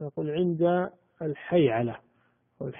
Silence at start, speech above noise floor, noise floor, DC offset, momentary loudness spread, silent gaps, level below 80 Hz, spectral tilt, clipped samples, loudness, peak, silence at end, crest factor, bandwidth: 0 s; 42 dB; -69 dBFS; under 0.1%; 13 LU; none; -66 dBFS; -6.5 dB/octave; under 0.1%; -27 LUFS; -10 dBFS; 0 s; 18 dB; 3.7 kHz